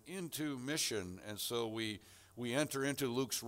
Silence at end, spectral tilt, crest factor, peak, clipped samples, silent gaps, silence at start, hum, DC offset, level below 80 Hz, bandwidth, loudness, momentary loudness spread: 0 s; -3.5 dB/octave; 16 dB; -22 dBFS; under 0.1%; none; 0.05 s; none; under 0.1%; -74 dBFS; 16 kHz; -39 LUFS; 9 LU